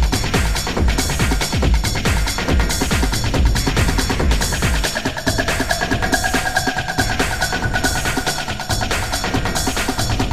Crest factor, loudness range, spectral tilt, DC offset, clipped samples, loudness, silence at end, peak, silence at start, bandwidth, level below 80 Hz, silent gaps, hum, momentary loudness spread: 16 dB; 1 LU; -3.5 dB/octave; under 0.1%; under 0.1%; -18 LUFS; 0 s; -2 dBFS; 0 s; 16 kHz; -22 dBFS; none; none; 2 LU